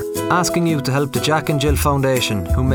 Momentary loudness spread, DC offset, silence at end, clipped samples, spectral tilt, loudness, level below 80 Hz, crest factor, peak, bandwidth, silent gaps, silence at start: 2 LU; under 0.1%; 0 s; under 0.1%; -5 dB/octave; -18 LUFS; -30 dBFS; 14 dB; -2 dBFS; over 20 kHz; none; 0 s